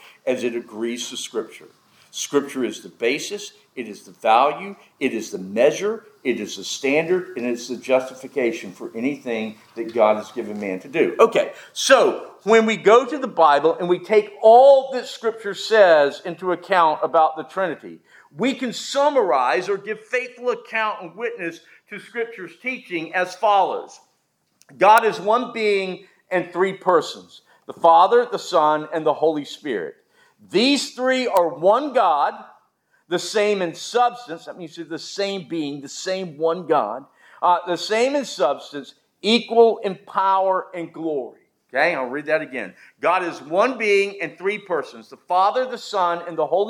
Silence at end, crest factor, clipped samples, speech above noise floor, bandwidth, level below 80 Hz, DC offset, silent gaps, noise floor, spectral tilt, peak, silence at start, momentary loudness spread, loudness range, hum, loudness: 0 s; 20 dB; under 0.1%; 48 dB; 19 kHz; -84 dBFS; under 0.1%; none; -68 dBFS; -3.5 dB/octave; 0 dBFS; 0.25 s; 15 LU; 8 LU; none; -20 LUFS